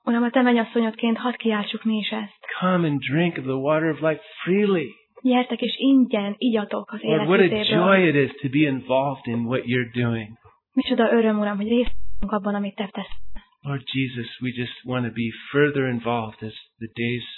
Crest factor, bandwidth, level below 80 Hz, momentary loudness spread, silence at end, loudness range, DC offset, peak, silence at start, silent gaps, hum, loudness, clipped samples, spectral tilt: 18 dB; 4.2 kHz; -48 dBFS; 12 LU; 0 s; 7 LU; under 0.1%; -4 dBFS; 0.05 s; none; none; -23 LUFS; under 0.1%; -10 dB/octave